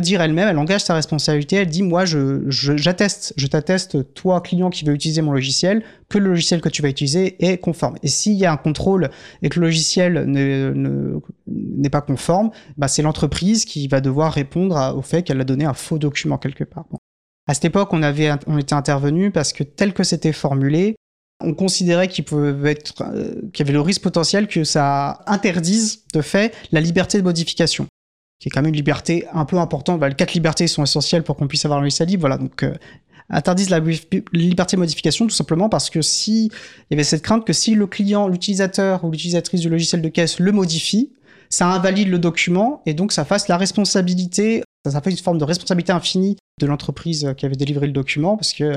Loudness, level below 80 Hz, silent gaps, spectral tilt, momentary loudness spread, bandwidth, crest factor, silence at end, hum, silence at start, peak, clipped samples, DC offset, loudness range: -18 LUFS; -46 dBFS; 16.98-17.47 s, 20.97-21.40 s, 27.89-28.40 s, 44.65-44.84 s, 46.40-46.58 s; -5 dB/octave; 6 LU; 13 kHz; 14 dB; 0 s; none; 0 s; -4 dBFS; under 0.1%; 0.1%; 2 LU